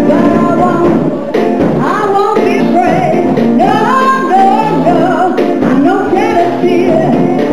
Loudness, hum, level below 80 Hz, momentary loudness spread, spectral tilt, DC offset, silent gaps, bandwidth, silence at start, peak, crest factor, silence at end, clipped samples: -9 LUFS; none; -42 dBFS; 2 LU; -7 dB/octave; 4%; none; 15 kHz; 0 s; 0 dBFS; 10 dB; 0 s; 0.3%